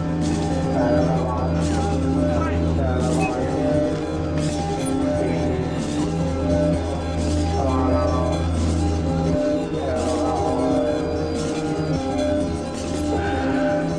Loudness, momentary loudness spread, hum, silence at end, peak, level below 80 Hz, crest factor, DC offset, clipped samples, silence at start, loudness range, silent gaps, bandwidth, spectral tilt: -22 LUFS; 4 LU; none; 0 s; -8 dBFS; -32 dBFS; 14 dB; under 0.1%; under 0.1%; 0 s; 2 LU; none; 11 kHz; -7 dB/octave